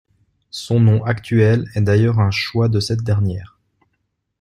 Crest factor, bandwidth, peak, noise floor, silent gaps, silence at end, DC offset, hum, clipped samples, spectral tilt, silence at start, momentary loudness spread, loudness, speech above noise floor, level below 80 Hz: 14 dB; 11 kHz; -2 dBFS; -71 dBFS; none; 0.95 s; under 0.1%; none; under 0.1%; -7 dB/octave; 0.55 s; 8 LU; -17 LUFS; 55 dB; -48 dBFS